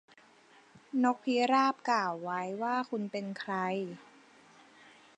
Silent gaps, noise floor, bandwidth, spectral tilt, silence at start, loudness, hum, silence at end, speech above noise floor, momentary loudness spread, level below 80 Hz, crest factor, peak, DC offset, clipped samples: none; -61 dBFS; 9 kHz; -5 dB/octave; 0.75 s; -32 LUFS; none; 1.15 s; 30 dB; 10 LU; -88 dBFS; 20 dB; -14 dBFS; under 0.1%; under 0.1%